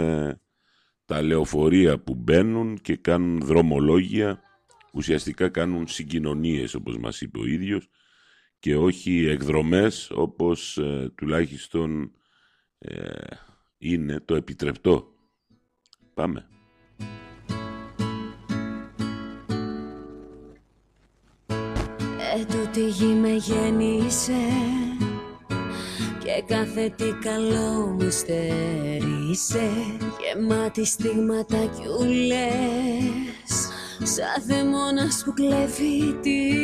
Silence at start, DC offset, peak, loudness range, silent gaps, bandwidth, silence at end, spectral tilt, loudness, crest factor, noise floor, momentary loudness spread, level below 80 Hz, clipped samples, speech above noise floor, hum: 0 s; under 0.1%; -6 dBFS; 10 LU; none; 15.5 kHz; 0 s; -5 dB/octave; -25 LUFS; 20 dB; -67 dBFS; 12 LU; -46 dBFS; under 0.1%; 44 dB; none